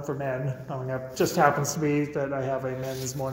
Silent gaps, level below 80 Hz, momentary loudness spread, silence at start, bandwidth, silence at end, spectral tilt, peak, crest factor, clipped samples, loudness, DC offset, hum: none; -58 dBFS; 10 LU; 0 s; 16.5 kHz; 0 s; -5.5 dB/octave; -6 dBFS; 22 dB; under 0.1%; -27 LUFS; under 0.1%; none